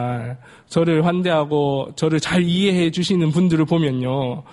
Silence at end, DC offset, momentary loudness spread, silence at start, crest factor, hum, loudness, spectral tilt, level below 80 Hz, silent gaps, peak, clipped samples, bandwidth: 0.1 s; under 0.1%; 7 LU; 0 s; 14 dB; none; -19 LUFS; -6.5 dB/octave; -52 dBFS; none; -4 dBFS; under 0.1%; 11.5 kHz